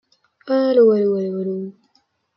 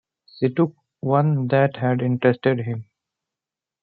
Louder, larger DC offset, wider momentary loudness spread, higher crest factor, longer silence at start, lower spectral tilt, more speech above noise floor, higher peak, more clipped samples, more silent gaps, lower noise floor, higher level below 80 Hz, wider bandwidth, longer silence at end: first, -18 LUFS vs -21 LUFS; neither; first, 14 LU vs 8 LU; about the same, 14 dB vs 18 dB; about the same, 0.45 s vs 0.4 s; second, -9.5 dB/octave vs -11.5 dB/octave; second, 47 dB vs 69 dB; about the same, -4 dBFS vs -4 dBFS; neither; neither; second, -64 dBFS vs -89 dBFS; about the same, -70 dBFS vs -66 dBFS; first, 5.8 kHz vs 4.7 kHz; second, 0.65 s vs 1 s